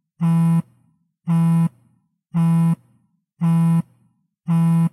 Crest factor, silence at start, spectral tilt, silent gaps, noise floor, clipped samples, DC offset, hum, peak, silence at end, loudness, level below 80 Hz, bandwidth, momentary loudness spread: 8 dB; 0.2 s; -9 dB/octave; none; -63 dBFS; under 0.1%; under 0.1%; none; -10 dBFS; 0.05 s; -19 LUFS; -62 dBFS; 11.5 kHz; 10 LU